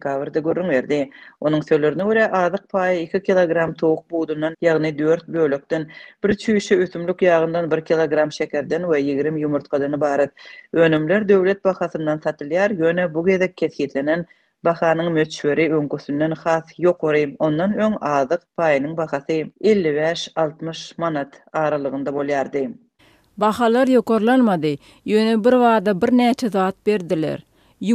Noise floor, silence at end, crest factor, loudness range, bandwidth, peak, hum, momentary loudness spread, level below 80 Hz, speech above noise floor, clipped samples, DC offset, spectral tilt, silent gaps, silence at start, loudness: -56 dBFS; 0 s; 16 dB; 4 LU; 13 kHz; -4 dBFS; none; 8 LU; -60 dBFS; 37 dB; under 0.1%; under 0.1%; -6.5 dB/octave; none; 0.05 s; -20 LUFS